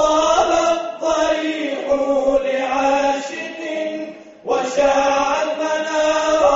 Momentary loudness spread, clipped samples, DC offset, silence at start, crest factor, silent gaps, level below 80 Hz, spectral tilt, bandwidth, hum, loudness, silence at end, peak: 10 LU; under 0.1%; under 0.1%; 0 s; 14 dB; none; -48 dBFS; -1 dB/octave; 8 kHz; none; -18 LUFS; 0 s; -4 dBFS